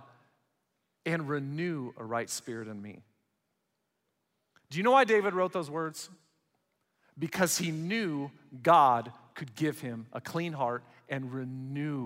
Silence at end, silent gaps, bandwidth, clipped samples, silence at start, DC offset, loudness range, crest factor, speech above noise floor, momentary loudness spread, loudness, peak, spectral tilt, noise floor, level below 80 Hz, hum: 0 s; none; 16 kHz; under 0.1%; 1.05 s; under 0.1%; 8 LU; 22 dB; 50 dB; 18 LU; -31 LUFS; -10 dBFS; -4.5 dB/octave; -81 dBFS; -80 dBFS; none